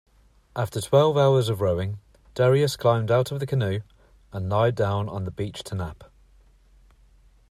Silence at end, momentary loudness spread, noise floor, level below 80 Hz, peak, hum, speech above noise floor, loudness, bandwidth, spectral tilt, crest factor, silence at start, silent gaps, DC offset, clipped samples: 1.45 s; 14 LU; -56 dBFS; -54 dBFS; -6 dBFS; none; 33 dB; -24 LUFS; 14.5 kHz; -6.5 dB/octave; 20 dB; 0.55 s; none; under 0.1%; under 0.1%